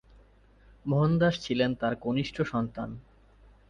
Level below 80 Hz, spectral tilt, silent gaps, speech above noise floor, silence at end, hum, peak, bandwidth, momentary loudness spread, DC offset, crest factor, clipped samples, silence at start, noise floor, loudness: -54 dBFS; -7 dB/octave; none; 30 dB; 0.7 s; none; -12 dBFS; 7.4 kHz; 15 LU; under 0.1%; 16 dB; under 0.1%; 0.85 s; -58 dBFS; -28 LUFS